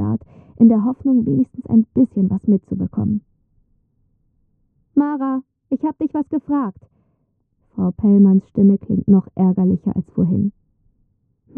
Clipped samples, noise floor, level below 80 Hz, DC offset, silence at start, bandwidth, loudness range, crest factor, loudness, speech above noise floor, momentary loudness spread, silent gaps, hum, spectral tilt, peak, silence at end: under 0.1%; -66 dBFS; -50 dBFS; under 0.1%; 0 s; 1.9 kHz; 8 LU; 16 dB; -18 LUFS; 50 dB; 10 LU; none; none; -13.5 dB/octave; -2 dBFS; 1.1 s